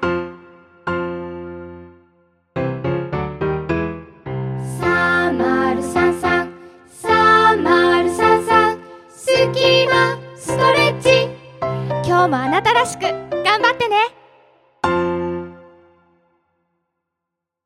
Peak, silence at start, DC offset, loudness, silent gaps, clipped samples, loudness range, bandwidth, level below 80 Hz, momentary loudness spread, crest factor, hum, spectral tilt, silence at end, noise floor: 0 dBFS; 0 s; under 0.1%; -17 LUFS; none; under 0.1%; 10 LU; 14 kHz; -50 dBFS; 16 LU; 18 dB; none; -5 dB/octave; 2.05 s; -82 dBFS